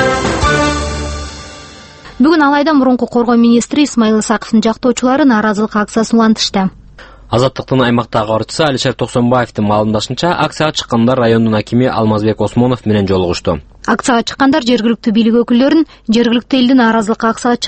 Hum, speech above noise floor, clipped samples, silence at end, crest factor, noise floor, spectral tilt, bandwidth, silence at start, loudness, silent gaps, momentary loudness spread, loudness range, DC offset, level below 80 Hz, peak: none; 25 dB; under 0.1%; 0 s; 12 dB; -36 dBFS; -5.5 dB/octave; 8.8 kHz; 0 s; -12 LUFS; none; 6 LU; 2 LU; under 0.1%; -34 dBFS; 0 dBFS